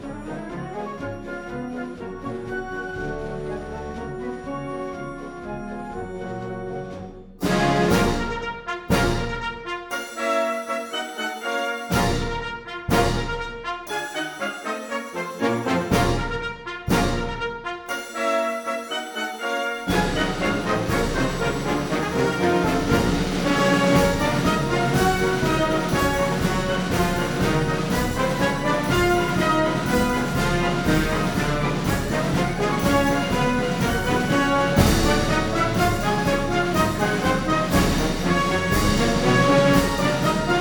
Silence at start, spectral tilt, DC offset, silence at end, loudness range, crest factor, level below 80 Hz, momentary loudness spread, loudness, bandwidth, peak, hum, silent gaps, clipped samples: 0 s; -5 dB/octave; under 0.1%; 0 s; 11 LU; 20 dB; -34 dBFS; 12 LU; -23 LUFS; over 20 kHz; -2 dBFS; none; none; under 0.1%